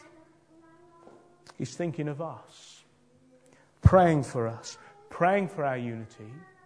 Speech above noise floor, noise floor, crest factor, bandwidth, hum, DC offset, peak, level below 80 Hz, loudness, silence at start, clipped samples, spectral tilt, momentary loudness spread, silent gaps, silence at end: 34 dB; -62 dBFS; 26 dB; 10.5 kHz; none; under 0.1%; -4 dBFS; -44 dBFS; -27 LUFS; 1.6 s; under 0.1%; -7 dB/octave; 26 LU; none; 0.25 s